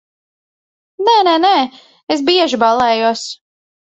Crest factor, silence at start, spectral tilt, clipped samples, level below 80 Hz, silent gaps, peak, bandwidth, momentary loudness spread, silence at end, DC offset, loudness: 16 dB; 1 s; -3 dB/octave; under 0.1%; -60 dBFS; 2.03-2.07 s; 0 dBFS; 8.4 kHz; 12 LU; 0.55 s; under 0.1%; -13 LUFS